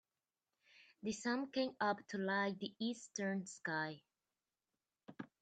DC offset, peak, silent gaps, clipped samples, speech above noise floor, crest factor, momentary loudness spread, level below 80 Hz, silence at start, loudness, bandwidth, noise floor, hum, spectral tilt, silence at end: under 0.1%; -24 dBFS; none; under 0.1%; over 49 dB; 20 dB; 13 LU; -86 dBFS; 0.8 s; -41 LUFS; 9 kHz; under -90 dBFS; none; -4.5 dB/octave; 0.15 s